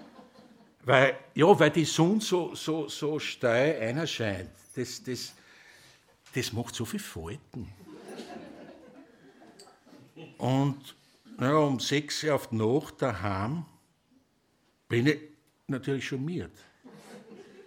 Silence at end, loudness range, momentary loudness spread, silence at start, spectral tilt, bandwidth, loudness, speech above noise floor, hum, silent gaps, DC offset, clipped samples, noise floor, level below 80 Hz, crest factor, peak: 0.05 s; 13 LU; 22 LU; 0 s; -5 dB/octave; 17 kHz; -28 LUFS; 42 dB; none; none; under 0.1%; under 0.1%; -70 dBFS; -64 dBFS; 26 dB; -4 dBFS